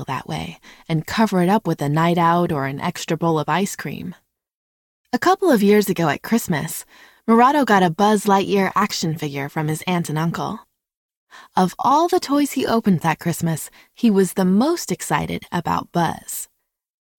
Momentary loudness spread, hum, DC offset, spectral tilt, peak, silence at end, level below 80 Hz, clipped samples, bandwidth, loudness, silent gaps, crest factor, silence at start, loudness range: 13 LU; none; under 0.1%; -5.5 dB/octave; -2 dBFS; 0.75 s; -54 dBFS; under 0.1%; 17.5 kHz; -19 LUFS; 4.54-5.04 s, 10.97-11.09 s, 11.16-11.27 s; 18 dB; 0 s; 4 LU